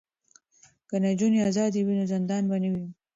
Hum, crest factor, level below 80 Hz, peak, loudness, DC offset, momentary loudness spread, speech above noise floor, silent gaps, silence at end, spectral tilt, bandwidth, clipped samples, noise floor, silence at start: none; 12 dB; -66 dBFS; -14 dBFS; -26 LUFS; under 0.1%; 7 LU; 38 dB; none; 0.2 s; -7 dB/octave; 7.8 kHz; under 0.1%; -63 dBFS; 0.9 s